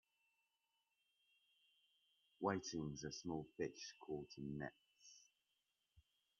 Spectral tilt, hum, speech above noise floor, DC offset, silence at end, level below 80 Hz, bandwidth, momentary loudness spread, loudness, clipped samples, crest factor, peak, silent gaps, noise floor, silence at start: -5 dB/octave; none; 41 dB; under 0.1%; 0.4 s; -78 dBFS; 7.2 kHz; 20 LU; -48 LUFS; under 0.1%; 26 dB; -26 dBFS; none; -88 dBFS; 2.4 s